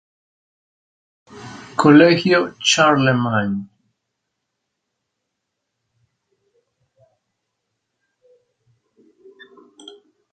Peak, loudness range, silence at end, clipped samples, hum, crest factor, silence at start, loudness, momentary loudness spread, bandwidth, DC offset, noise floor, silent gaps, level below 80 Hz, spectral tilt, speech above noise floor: 0 dBFS; 12 LU; 6.65 s; under 0.1%; none; 22 dB; 1.35 s; -15 LUFS; 17 LU; 9.4 kHz; under 0.1%; -78 dBFS; none; -62 dBFS; -4.5 dB/octave; 63 dB